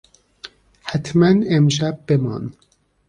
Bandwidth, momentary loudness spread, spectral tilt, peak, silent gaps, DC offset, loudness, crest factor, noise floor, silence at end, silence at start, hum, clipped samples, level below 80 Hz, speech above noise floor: 10 kHz; 24 LU; -6.5 dB/octave; -4 dBFS; none; under 0.1%; -18 LUFS; 16 dB; -43 dBFS; 0.6 s; 0.45 s; none; under 0.1%; -52 dBFS; 26 dB